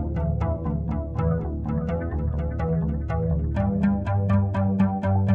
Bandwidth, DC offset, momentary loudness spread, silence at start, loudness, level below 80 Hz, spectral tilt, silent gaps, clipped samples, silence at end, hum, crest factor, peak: 4.2 kHz; under 0.1%; 5 LU; 0 s; -25 LUFS; -32 dBFS; -11 dB/octave; none; under 0.1%; 0 s; none; 14 dB; -10 dBFS